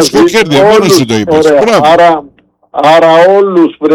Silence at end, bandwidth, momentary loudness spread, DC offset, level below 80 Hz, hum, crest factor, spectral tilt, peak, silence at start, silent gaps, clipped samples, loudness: 0 s; 19 kHz; 5 LU; under 0.1%; -42 dBFS; none; 6 dB; -4.5 dB/octave; 0 dBFS; 0 s; none; 0.2%; -6 LUFS